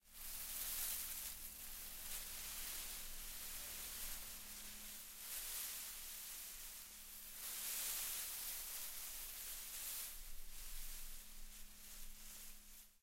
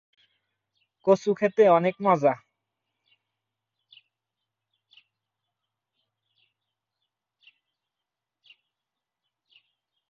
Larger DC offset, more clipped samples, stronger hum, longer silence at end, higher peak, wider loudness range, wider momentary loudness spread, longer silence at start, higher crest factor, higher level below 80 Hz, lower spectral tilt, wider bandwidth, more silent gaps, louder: neither; neither; neither; second, 0.05 s vs 7.75 s; second, -28 dBFS vs -6 dBFS; about the same, 5 LU vs 7 LU; first, 13 LU vs 8 LU; second, 0.05 s vs 1.05 s; about the same, 20 dB vs 22 dB; first, -58 dBFS vs -80 dBFS; second, 0.5 dB/octave vs -7 dB/octave; first, 16 kHz vs 7.4 kHz; neither; second, -47 LUFS vs -22 LUFS